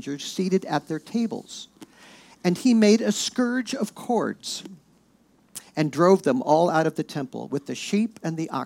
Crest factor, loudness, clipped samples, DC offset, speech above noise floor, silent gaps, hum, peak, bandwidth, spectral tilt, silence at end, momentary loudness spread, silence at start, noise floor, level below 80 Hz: 18 dB; -24 LUFS; under 0.1%; under 0.1%; 37 dB; none; none; -6 dBFS; 16.5 kHz; -5 dB/octave; 0 s; 15 LU; 0 s; -60 dBFS; -72 dBFS